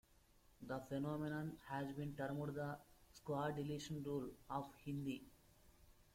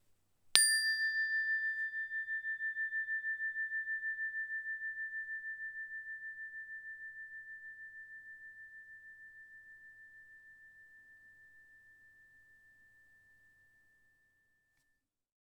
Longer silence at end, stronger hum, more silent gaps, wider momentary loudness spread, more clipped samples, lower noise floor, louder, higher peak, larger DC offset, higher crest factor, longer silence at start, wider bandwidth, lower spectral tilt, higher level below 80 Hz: second, 0.1 s vs 3.05 s; neither; neither; second, 9 LU vs 24 LU; neither; second, -71 dBFS vs -82 dBFS; second, -47 LUFS vs -35 LUFS; second, -30 dBFS vs -2 dBFS; neither; second, 16 dB vs 38 dB; second, 0.1 s vs 0.45 s; second, 16.5 kHz vs over 20 kHz; first, -6.5 dB/octave vs 4 dB/octave; first, -70 dBFS vs -84 dBFS